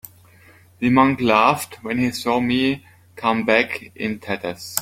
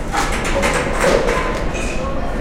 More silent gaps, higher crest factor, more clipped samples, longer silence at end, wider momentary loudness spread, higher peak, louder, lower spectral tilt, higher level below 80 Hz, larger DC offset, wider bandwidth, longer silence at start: neither; about the same, 20 dB vs 16 dB; neither; about the same, 0 s vs 0 s; first, 11 LU vs 7 LU; about the same, 0 dBFS vs -2 dBFS; about the same, -20 LUFS vs -18 LUFS; about the same, -4.5 dB/octave vs -4 dB/octave; second, -54 dBFS vs -24 dBFS; neither; about the same, 16.5 kHz vs 16 kHz; first, 0.8 s vs 0 s